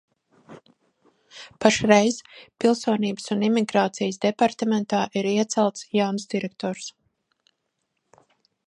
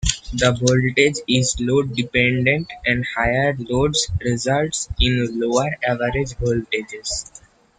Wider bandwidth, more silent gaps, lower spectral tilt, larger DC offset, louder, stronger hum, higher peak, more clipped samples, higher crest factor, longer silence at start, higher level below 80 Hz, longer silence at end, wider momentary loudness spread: first, 11 kHz vs 9.6 kHz; neither; about the same, -4.5 dB/octave vs -4 dB/octave; neither; second, -23 LUFS vs -20 LUFS; neither; about the same, 0 dBFS vs -2 dBFS; neither; first, 24 dB vs 18 dB; first, 0.5 s vs 0 s; second, -64 dBFS vs -34 dBFS; first, 1.75 s vs 0.4 s; first, 12 LU vs 7 LU